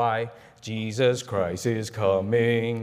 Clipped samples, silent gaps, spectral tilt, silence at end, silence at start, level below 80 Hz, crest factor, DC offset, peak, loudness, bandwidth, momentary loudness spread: under 0.1%; none; -5.5 dB/octave; 0 s; 0 s; -64 dBFS; 14 dB; under 0.1%; -10 dBFS; -25 LUFS; 15.5 kHz; 11 LU